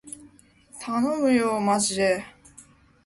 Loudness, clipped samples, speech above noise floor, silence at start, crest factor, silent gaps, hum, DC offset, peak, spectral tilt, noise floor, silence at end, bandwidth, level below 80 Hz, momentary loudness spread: -23 LUFS; under 0.1%; 31 dB; 0.05 s; 16 dB; none; none; under 0.1%; -10 dBFS; -4 dB/octave; -54 dBFS; 0.45 s; 11.5 kHz; -62 dBFS; 20 LU